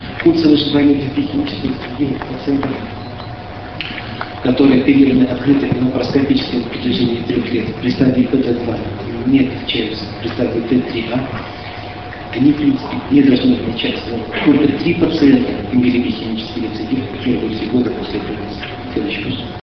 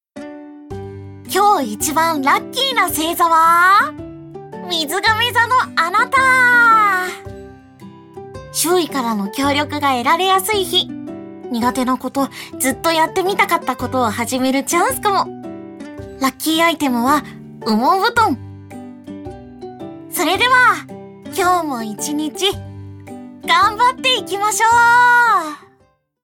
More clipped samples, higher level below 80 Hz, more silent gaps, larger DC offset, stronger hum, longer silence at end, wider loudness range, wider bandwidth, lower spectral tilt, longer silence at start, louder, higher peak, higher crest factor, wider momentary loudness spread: neither; first, -38 dBFS vs -50 dBFS; neither; first, 0.5% vs under 0.1%; neither; second, 0.1 s vs 0.65 s; about the same, 6 LU vs 5 LU; second, 6.2 kHz vs 19 kHz; first, -8 dB/octave vs -2.5 dB/octave; second, 0 s vs 0.15 s; about the same, -16 LUFS vs -15 LUFS; about the same, 0 dBFS vs 0 dBFS; about the same, 16 dB vs 16 dB; second, 13 LU vs 23 LU